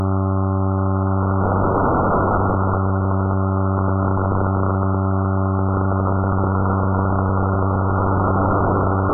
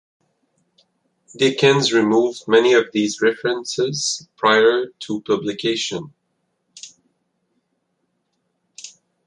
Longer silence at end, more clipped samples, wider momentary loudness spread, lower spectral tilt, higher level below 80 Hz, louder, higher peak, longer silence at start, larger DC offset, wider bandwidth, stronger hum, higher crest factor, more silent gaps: second, 0 s vs 0.4 s; neither; second, 2 LU vs 24 LU; first, -7 dB/octave vs -4 dB/octave; first, -36 dBFS vs -68 dBFS; about the same, -19 LUFS vs -18 LUFS; second, -6 dBFS vs -2 dBFS; second, 0 s vs 1.35 s; neither; second, 1.6 kHz vs 11 kHz; neither; second, 12 dB vs 20 dB; neither